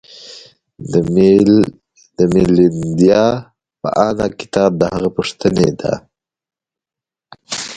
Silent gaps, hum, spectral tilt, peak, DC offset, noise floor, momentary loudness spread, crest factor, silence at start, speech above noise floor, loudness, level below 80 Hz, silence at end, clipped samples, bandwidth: none; none; -6.5 dB/octave; 0 dBFS; under 0.1%; -88 dBFS; 15 LU; 16 dB; 0.2 s; 75 dB; -14 LUFS; -44 dBFS; 0 s; under 0.1%; 11 kHz